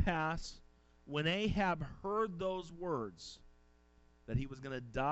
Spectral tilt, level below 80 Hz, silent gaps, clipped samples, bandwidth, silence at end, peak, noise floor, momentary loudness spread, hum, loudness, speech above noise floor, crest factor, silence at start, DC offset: -6 dB/octave; -52 dBFS; none; under 0.1%; 8.2 kHz; 0 s; -20 dBFS; -67 dBFS; 16 LU; none; -38 LUFS; 29 dB; 18 dB; 0 s; under 0.1%